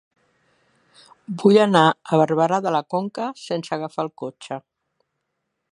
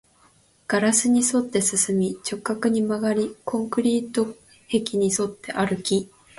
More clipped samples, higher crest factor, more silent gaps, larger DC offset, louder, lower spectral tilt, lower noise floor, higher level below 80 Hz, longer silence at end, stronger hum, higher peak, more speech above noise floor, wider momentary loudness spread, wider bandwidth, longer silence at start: neither; about the same, 22 dB vs 18 dB; neither; neither; first, -20 LUFS vs -23 LUFS; first, -6 dB/octave vs -4 dB/octave; first, -77 dBFS vs -58 dBFS; second, -72 dBFS vs -62 dBFS; first, 1.1 s vs 0.3 s; neither; first, 0 dBFS vs -6 dBFS; first, 57 dB vs 36 dB; first, 19 LU vs 8 LU; about the same, 11 kHz vs 12 kHz; first, 1.3 s vs 0.7 s